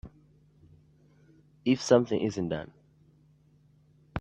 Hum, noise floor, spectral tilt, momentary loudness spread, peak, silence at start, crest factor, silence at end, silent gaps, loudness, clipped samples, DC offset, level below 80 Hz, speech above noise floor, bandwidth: none; -62 dBFS; -6 dB/octave; 16 LU; -8 dBFS; 0.05 s; 24 dB; 0 s; none; -28 LUFS; under 0.1%; under 0.1%; -62 dBFS; 36 dB; 9.8 kHz